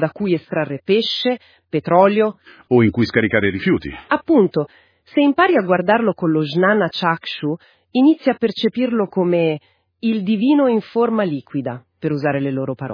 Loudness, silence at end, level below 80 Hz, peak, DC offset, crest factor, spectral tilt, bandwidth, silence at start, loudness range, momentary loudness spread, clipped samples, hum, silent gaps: -18 LUFS; 0 s; -54 dBFS; 0 dBFS; under 0.1%; 18 dB; -8 dB/octave; 5.2 kHz; 0 s; 2 LU; 10 LU; under 0.1%; none; none